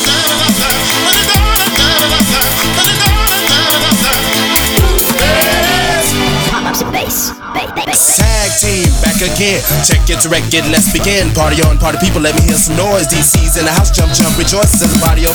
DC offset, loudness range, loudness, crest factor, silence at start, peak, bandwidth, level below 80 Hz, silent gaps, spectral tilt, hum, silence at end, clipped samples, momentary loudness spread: 2%; 2 LU; -9 LUFS; 10 dB; 0 s; 0 dBFS; over 20 kHz; -18 dBFS; none; -3 dB/octave; none; 0 s; under 0.1%; 4 LU